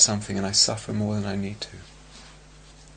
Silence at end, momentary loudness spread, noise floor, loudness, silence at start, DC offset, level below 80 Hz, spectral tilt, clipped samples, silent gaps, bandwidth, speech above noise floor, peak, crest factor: 0 s; 17 LU; -49 dBFS; -23 LUFS; 0 s; under 0.1%; -52 dBFS; -2.5 dB/octave; under 0.1%; none; 9.6 kHz; 23 dB; -2 dBFS; 26 dB